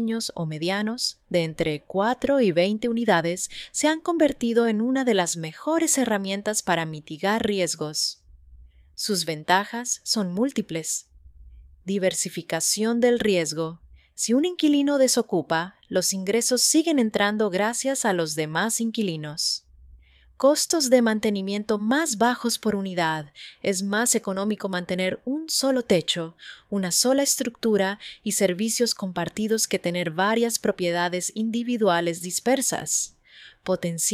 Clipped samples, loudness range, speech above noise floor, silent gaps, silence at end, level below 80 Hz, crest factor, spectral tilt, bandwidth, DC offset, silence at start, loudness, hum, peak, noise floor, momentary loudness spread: under 0.1%; 4 LU; 28 dB; none; 0 s; -58 dBFS; 20 dB; -3.5 dB/octave; 16 kHz; under 0.1%; 0 s; -24 LUFS; none; -4 dBFS; -52 dBFS; 8 LU